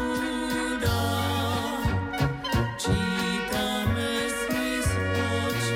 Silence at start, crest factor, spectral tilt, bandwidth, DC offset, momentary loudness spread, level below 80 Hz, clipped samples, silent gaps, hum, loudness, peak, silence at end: 0 s; 14 dB; -4.5 dB/octave; 16.5 kHz; under 0.1%; 2 LU; -40 dBFS; under 0.1%; none; none; -27 LUFS; -12 dBFS; 0 s